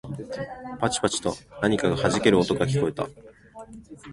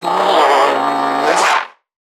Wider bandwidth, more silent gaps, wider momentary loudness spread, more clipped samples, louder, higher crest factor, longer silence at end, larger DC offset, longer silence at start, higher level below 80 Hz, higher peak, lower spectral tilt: second, 11.5 kHz vs 17.5 kHz; neither; first, 23 LU vs 6 LU; neither; second, -25 LUFS vs -13 LUFS; first, 22 dB vs 14 dB; second, 0 s vs 0.45 s; neither; about the same, 0.05 s vs 0 s; first, -50 dBFS vs -72 dBFS; second, -4 dBFS vs 0 dBFS; first, -5 dB/octave vs -2 dB/octave